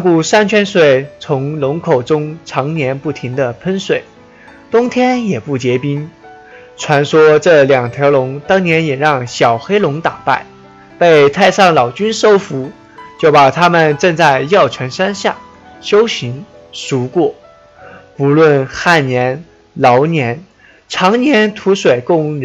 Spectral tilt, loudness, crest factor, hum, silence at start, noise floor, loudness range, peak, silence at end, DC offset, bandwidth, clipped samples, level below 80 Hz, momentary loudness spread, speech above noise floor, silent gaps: -5.5 dB/octave; -12 LUFS; 12 dB; none; 0 s; -39 dBFS; 6 LU; 0 dBFS; 0 s; under 0.1%; 9 kHz; under 0.1%; -52 dBFS; 12 LU; 28 dB; none